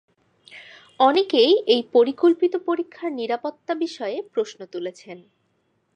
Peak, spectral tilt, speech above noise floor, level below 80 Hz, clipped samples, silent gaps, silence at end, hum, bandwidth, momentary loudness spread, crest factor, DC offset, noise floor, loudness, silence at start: -4 dBFS; -4 dB/octave; 47 dB; -80 dBFS; under 0.1%; none; 0.75 s; none; 9.4 kHz; 16 LU; 18 dB; under 0.1%; -69 dBFS; -21 LUFS; 0.55 s